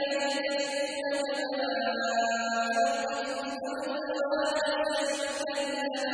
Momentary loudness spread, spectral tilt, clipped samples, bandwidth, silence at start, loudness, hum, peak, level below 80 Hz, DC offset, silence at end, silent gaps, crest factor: 5 LU; -1.5 dB/octave; under 0.1%; 10.5 kHz; 0 s; -30 LUFS; none; -16 dBFS; -72 dBFS; under 0.1%; 0 s; none; 14 dB